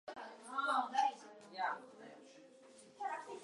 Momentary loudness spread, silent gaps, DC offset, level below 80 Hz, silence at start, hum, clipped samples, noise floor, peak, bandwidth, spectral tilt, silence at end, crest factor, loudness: 24 LU; none; under 0.1%; under -90 dBFS; 0.05 s; none; under 0.1%; -61 dBFS; -22 dBFS; 11.5 kHz; -2 dB/octave; 0 s; 20 dB; -40 LUFS